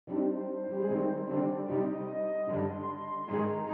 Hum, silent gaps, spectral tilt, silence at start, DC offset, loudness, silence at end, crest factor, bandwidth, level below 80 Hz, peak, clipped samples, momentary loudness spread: none; none; -9 dB/octave; 0.05 s; under 0.1%; -33 LUFS; 0 s; 14 dB; 3.5 kHz; -76 dBFS; -18 dBFS; under 0.1%; 4 LU